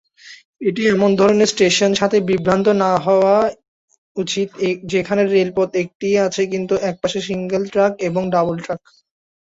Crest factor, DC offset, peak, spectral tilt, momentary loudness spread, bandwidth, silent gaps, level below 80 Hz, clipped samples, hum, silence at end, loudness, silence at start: 16 dB; under 0.1%; -2 dBFS; -5 dB/octave; 9 LU; 8 kHz; 0.45-0.54 s, 3.68-3.88 s, 3.98-4.15 s, 5.95-6.00 s; -54 dBFS; under 0.1%; none; 0.75 s; -17 LUFS; 0.25 s